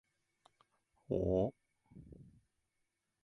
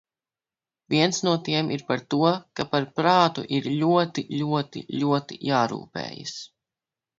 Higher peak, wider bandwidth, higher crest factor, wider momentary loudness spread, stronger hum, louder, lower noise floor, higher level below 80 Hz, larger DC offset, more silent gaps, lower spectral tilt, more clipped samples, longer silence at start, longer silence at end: second, -22 dBFS vs -4 dBFS; first, 10.5 kHz vs 7.8 kHz; about the same, 22 dB vs 20 dB; first, 24 LU vs 12 LU; neither; second, -37 LUFS vs -24 LUFS; second, -85 dBFS vs under -90 dBFS; first, -58 dBFS vs -66 dBFS; neither; neither; first, -10.5 dB/octave vs -5 dB/octave; neither; first, 1.1 s vs 0.9 s; first, 1 s vs 0.7 s